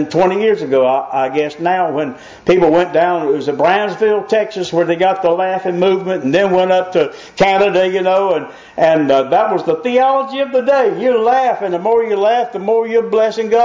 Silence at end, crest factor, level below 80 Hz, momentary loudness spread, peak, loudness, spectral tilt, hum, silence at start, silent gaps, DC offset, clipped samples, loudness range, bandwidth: 0 s; 10 dB; -54 dBFS; 5 LU; -2 dBFS; -14 LUFS; -6 dB/octave; none; 0 s; none; under 0.1%; under 0.1%; 1 LU; 7.6 kHz